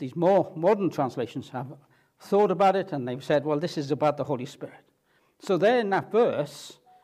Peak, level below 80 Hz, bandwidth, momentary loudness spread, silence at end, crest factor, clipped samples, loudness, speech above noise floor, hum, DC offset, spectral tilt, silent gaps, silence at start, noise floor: -10 dBFS; -76 dBFS; 14.5 kHz; 17 LU; 0.3 s; 16 dB; under 0.1%; -25 LUFS; 42 dB; none; under 0.1%; -6.5 dB/octave; none; 0 s; -67 dBFS